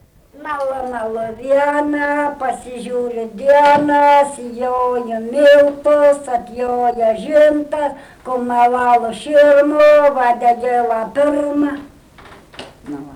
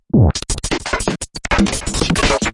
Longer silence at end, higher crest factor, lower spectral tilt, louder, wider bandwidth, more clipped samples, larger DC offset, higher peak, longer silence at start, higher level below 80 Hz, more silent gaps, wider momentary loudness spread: about the same, 0 s vs 0 s; second, 10 dB vs 16 dB; about the same, -4.5 dB/octave vs -4.5 dB/octave; first, -14 LUFS vs -17 LUFS; about the same, 11.5 kHz vs 11.5 kHz; neither; neither; about the same, -4 dBFS vs -2 dBFS; first, 0.4 s vs 0.15 s; second, -50 dBFS vs -26 dBFS; neither; first, 13 LU vs 7 LU